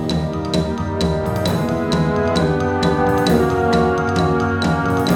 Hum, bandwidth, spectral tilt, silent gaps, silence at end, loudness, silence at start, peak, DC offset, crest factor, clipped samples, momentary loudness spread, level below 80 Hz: none; 18.5 kHz; -6.5 dB/octave; none; 0 s; -18 LUFS; 0 s; -4 dBFS; under 0.1%; 14 dB; under 0.1%; 5 LU; -34 dBFS